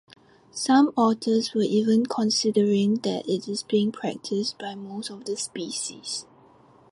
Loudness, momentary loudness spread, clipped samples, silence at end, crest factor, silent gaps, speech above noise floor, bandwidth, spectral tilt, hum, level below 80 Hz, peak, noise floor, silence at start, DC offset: -25 LUFS; 13 LU; under 0.1%; 0.7 s; 16 dB; none; 30 dB; 11.5 kHz; -4.5 dB/octave; none; -70 dBFS; -8 dBFS; -55 dBFS; 0.55 s; under 0.1%